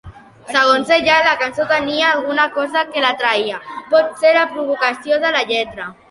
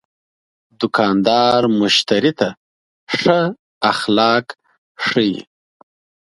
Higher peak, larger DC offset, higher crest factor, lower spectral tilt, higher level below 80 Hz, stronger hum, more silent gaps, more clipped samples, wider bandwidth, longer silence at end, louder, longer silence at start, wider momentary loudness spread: about the same, 0 dBFS vs 0 dBFS; neither; about the same, 16 dB vs 18 dB; second, -3 dB/octave vs -4.5 dB/octave; about the same, -54 dBFS vs -58 dBFS; neither; second, none vs 2.57-3.07 s, 3.59-3.81 s, 4.78-4.95 s; neither; about the same, 11.5 kHz vs 11.5 kHz; second, 0.2 s vs 0.9 s; about the same, -15 LUFS vs -16 LUFS; second, 0.05 s vs 0.8 s; about the same, 7 LU vs 9 LU